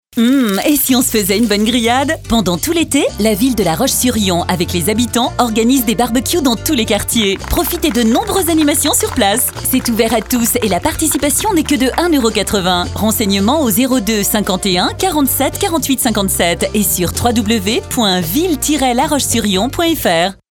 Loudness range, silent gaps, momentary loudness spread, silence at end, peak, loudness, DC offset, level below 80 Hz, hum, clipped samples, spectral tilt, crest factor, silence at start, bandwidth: 1 LU; none; 3 LU; 0.2 s; 0 dBFS; -13 LUFS; under 0.1%; -32 dBFS; none; under 0.1%; -3.5 dB/octave; 14 dB; 0.15 s; 18.5 kHz